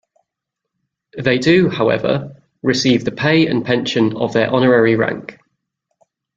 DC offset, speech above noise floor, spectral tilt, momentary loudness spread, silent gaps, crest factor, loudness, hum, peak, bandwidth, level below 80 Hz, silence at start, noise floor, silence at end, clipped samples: under 0.1%; 65 dB; -6 dB/octave; 10 LU; none; 16 dB; -16 LUFS; none; 0 dBFS; 7.8 kHz; -52 dBFS; 1.15 s; -80 dBFS; 1.05 s; under 0.1%